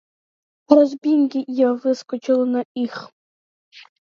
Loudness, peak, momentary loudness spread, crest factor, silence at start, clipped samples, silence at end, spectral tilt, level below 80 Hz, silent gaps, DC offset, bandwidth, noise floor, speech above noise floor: -19 LUFS; 0 dBFS; 11 LU; 20 dB; 0.7 s; under 0.1%; 0.25 s; -5.5 dB/octave; -78 dBFS; 2.65-2.75 s, 3.12-3.71 s; under 0.1%; 7.2 kHz; under -90 dBFS; over 72 dB